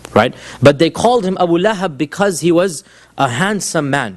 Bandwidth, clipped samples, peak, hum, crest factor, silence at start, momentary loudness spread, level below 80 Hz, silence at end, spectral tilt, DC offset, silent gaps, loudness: 12.5 kHz; 0.2%; 0 dBFS; none; 14 dB; 0.1 s; 7 LU; -48 dBFS; 0 s; -5 dB/octave; under 0.1%; none; -14 LUFS